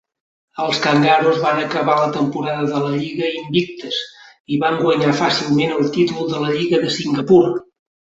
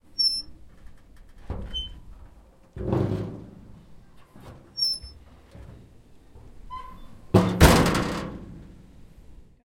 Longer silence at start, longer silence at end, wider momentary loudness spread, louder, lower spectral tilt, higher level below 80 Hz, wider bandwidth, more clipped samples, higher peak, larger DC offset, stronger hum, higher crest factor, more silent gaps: first, 0.55 s vs 0.2 s; first, 0.45 s vs 0.3 s; second, 10 LU vs 29 LU; first, -17 LUFS vs -24 LUFS; about the same, -5.5 dB/octave vs -5 dB/octave; second, -58 dBFS vs -38 dBFS; second, 8 kHz vs 16.5 kHz; neither; about the same, -2 dBFS vs -2 dBFS; neither; neither; second, 16 dB vs 26 dB; first, 4.40-4.45 s vs none